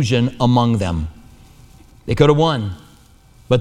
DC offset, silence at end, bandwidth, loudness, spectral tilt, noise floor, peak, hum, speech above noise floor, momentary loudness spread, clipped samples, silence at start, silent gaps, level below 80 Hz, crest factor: under 0.1%; 0 s; 11.5 kHz; -17 LUFS; -7 dB/octave; -48 dBFS; 0 dBFS; none; 32 dB; 17 LU; under 0.1%; 0 s; none; -38 dBFS; 18 dB